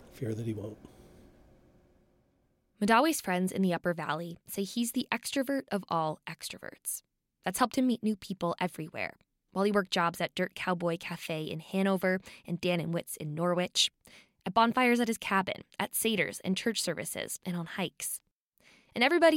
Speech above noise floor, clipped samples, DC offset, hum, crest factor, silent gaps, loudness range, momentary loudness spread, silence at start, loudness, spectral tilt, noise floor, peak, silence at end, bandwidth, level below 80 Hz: 41 dB; under 0.1%; under 0.1%; none; 20 dB; 18.31-18.52 s; 4 LU; 12 LU; 0 s; -31 LUFS; -4 dB/octave; -72 dBFS; -12 dBFS; 0 s; 16.5 kHz; -68 dBFS